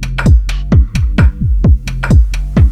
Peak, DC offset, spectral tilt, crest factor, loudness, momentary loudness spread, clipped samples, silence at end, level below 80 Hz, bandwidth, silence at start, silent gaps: 0 dBFS; under 0.1%; -7.5 dB/octave; 10 dB; -12 LUFS; 2 LU; under 0.1%; 0 s; -12 dBFS; 9.4 kHz; 0 s; none